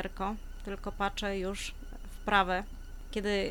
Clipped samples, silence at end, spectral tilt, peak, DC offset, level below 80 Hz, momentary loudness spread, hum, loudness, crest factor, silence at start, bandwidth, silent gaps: under 0.1%; 0 s; -4 dB/octave; -10 dBFS; under 0.1%; -42 dBFS; 19 LU; none; -34 LUFS; 22 dB; 0 s; 19.5 kHz; none